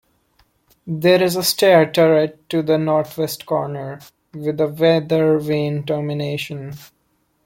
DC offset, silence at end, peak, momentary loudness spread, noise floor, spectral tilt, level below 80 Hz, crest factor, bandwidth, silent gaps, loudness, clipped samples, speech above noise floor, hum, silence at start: under 0.1%; 0.6 s; -2 dBFS; 16 LU; -65 dBFS; -5.5 dB/octave; -60 dBFS; 18 dB; 17 kHz; none; -18 LUFS; under 0.1%; 47 dB; none; 0.85 s